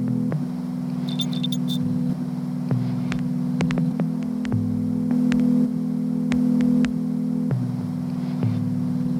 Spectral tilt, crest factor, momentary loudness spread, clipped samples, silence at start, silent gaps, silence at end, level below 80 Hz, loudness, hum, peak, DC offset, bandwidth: -7.5 dB/octave; 18 dB; 7 LU; under 0.1%; 0 s; none; 0 s; -52 dBFS; -24 LUFS; none; -4 dBFS; under 0.1%; 17.5 kHz